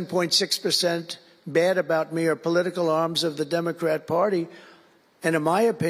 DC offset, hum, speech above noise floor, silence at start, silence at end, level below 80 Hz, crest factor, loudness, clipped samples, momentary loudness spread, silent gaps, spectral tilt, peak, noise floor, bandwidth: under 0.1%; none; 33 dB; 0 s; 0 s; -74 dBFS; 16 dB; -24 LUFS; under 0.1%; 8 LU; none; -4 dB/octave; -8 dBFS; -56 dBFS; 16 kHz